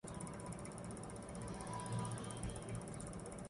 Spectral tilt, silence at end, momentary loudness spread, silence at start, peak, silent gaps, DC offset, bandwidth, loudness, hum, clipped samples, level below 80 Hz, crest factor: -5 dB/octave; 0 s; 5 LU; 0.05 s; -28 dBFS; none; under 0.1%; 11.5 kHz; -47 LUFS; none; under 0.1%; -58 dBFS; 18 dB